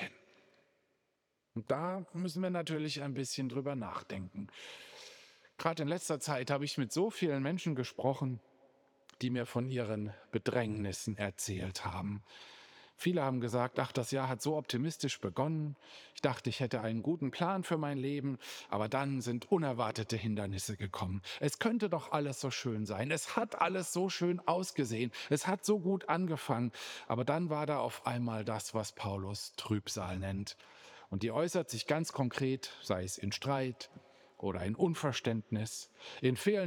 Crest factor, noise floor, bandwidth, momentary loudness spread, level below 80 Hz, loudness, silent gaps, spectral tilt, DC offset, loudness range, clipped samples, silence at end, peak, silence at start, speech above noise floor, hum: 22 dB; -82 dBFS; over 20 kHz; 9 LU; -74 dBFS; -36 LUFS; none; -5 dB/octave; under 0.1%; 4 LU; under 0.1%; 0 s; -14 dBFS; 0 s; 46 dB; none